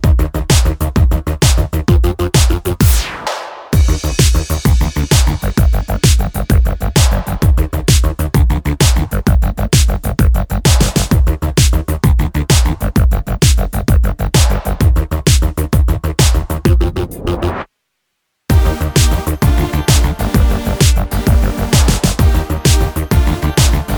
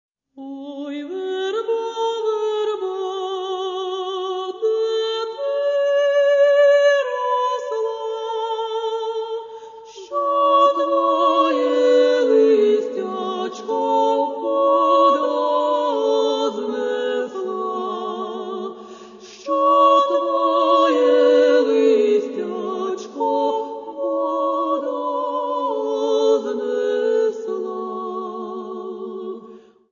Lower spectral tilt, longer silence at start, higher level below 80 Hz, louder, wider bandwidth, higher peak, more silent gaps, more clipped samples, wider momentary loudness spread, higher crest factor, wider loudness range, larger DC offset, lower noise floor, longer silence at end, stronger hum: first, -5 dB/octave vs -3.5 dB/octave; second, 0 s vs 0.35 s; first, -14 dBFS vs -76 dBFS; first, -14 LUFS vs -19 LUFS; first, over 20 kHz vs 7.4 kHz; first, 0 dBFS vs -4 dBFS; neither; neither; second, 3 LU vs 15 LU; about the same, 12 dB vs 16 dB; second, 2 LU vs 7 LU; neither; first, -70 dBFS vs -44 dBFS; second, 0 s vs 0.35 s; neither